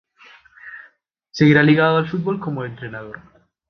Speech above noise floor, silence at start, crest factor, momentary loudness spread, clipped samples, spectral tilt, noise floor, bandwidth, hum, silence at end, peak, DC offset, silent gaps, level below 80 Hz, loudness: 38 dB; 0.65 s; 18 dB; 25 LU; under 0.1%; -7.5 dB/octave; -55 dBFS; 6.4 kHz; none; 0.5 s; -2 dBFS; under 0.1%; none; -58 dBFS; -17 LUFS